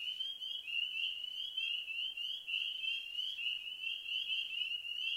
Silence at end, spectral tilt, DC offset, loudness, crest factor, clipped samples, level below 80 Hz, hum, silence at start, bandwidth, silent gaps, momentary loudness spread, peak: 0 s; 2.5 dB/octave; under 0.1%; -37 LUFS; 14 dB; under 0.1%; -80 dBFS; none; 0 s; 16 kHz; none; 4 LU; -26 dBFS